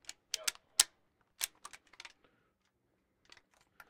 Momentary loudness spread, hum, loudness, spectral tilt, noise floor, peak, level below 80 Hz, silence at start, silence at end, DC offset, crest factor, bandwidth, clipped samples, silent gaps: 23 LU; none; -35 LUFS; 3.5 dB/octave; -79 dBFS; -2 dBFS; -76 dBFS; 0.35 s; 1.8 s; under 0.1%; 40 dB; 16.5 kHz; under 0.1%; none